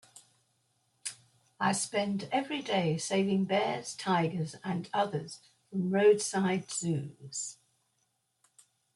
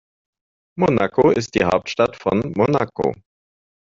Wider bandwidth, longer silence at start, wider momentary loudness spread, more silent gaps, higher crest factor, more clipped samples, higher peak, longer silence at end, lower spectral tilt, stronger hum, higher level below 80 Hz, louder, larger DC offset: first, 12 kHz vs 7.8 kHz; second, 0.15 s vs 0.75 s; first, 14 LU vs 7 LU; neither; about the same, 18 dB vs 18 dB; neither; second, -14 dBFS vs -2 dBFS; first, 1.4 s vs 0.85 s; about the same, -4.5 dB/octave vs -5.5 dB/octave; neither; second, -76 dBFS vs -50 dBFS; second, -31 LUFS vs -19 LUFS; neither